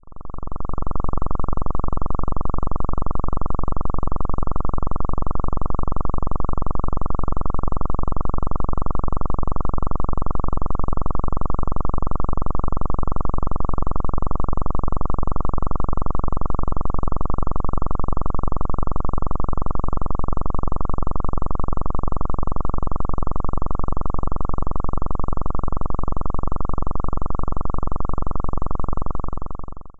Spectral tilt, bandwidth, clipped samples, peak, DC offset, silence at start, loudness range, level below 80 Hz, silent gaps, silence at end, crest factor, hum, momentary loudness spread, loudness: -12 dB/octave; 1.5 kHz; under 0.1%; -6 dBFS; under 0.1%; 0.05 s; 1 LU; -24 dBFS; none; 0.1 s; 8 dB; none; 1 LU; -28 LUFS